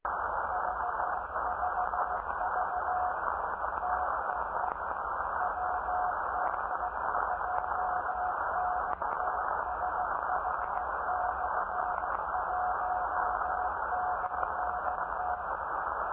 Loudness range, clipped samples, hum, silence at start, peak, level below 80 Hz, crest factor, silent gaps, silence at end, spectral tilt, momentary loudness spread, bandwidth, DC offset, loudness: 1 LU; under 0.1%; none; 0.05 s; -14 dBFS; -54 dBFS; 18 dB; none; 0 s; -4 dB/octave; 2 LU; 4 kHz; under 0.1%; -32 LUFS